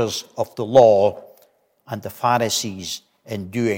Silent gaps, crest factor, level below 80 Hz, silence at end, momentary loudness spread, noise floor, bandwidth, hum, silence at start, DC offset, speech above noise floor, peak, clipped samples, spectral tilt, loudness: none; 18 dB; -62 dBFS; 0 s; 19 LU; -58 dBFS; 17 kHz; none; 0 s; under 0.1%; 39 dB; -2 dBFS; under 0.1%; -4.5 dB/octave; -19 LUFS